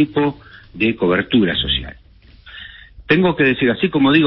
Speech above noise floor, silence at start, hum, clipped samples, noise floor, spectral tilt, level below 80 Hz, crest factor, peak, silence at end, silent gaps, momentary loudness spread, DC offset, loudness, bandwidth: 28 dB; 0 s; none; under 0.1%; -44 dBFS; -11 dB/octave; -40 dBFS; 16 dB; 0 dBFS; 0 s; none; 21 LU; under 0.1%; -16 LUFS; 5.8 kHz